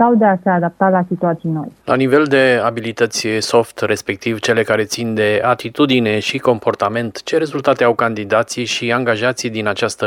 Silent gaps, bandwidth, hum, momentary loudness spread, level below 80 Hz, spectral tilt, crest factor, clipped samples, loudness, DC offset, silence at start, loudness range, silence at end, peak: none; 16.5 kHz; none; 6 LU; -58 dBFS; -5 dB/octave; 16 dB; under 0.1%; -16 LUFS; under 0.1%; 0 s; 1 LU; 0 s; 0 dBFS